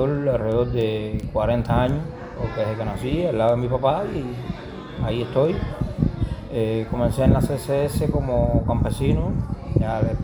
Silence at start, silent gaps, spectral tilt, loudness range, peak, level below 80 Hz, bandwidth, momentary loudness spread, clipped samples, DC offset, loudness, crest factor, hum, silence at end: 0 s; none; -8 dB/octave; 3 LU; -2 dBFS; -32 dBFS; over 20 kHz; 8 LU; under 0.1%; under 0.1%; -23 LUFS; 20 dB; none; 0 s